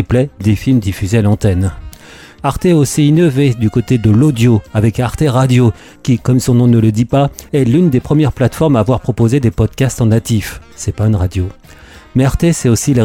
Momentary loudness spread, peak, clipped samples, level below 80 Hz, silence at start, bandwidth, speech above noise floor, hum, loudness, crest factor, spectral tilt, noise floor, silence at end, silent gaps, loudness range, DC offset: 7 LU; -2 dBFS; under 0.1%; -32 dBFS; 0 s; 16 kHz; 25 dB; none; -13 LUFS; 10 dB; -7 dB/octave; -36 dBFS; 0 s; none; 3 LU; under 0.1%